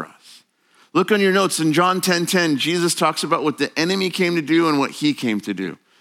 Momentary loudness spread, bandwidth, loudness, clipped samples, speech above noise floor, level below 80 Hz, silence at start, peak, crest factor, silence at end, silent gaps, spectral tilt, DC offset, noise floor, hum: 7 LU; 17 kHz; -19 LUFS; under 0.1%; 38 dB; -74 dBFS; 0 s; -2 dBFS; 18 dB; 0.25 s; none; -4 dB/octave; under 0.1%; -57 dBFS; none